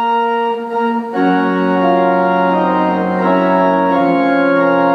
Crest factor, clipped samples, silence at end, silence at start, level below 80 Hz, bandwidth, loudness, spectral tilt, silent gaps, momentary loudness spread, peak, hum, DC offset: 12 dB; under 0.1%; 0 s; 0 s; -64 dBFS; 6 kHz; -14 LUFS; -8.5 dB/octave; none; 5 LU; -2 dBFS; none; under 0.1%